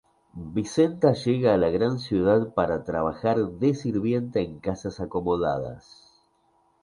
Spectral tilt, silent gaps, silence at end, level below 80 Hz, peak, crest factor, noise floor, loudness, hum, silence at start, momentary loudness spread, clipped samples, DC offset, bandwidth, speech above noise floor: -7.5 dB/octave; none; 1.05 s; -50 dBFS; -6 dBFS; 18 dB; -66 dBFS; -25 LUFS; none; 0.35 s; 10 LU; under 0.1%; under 0.1%; 11 kHz; 41 dB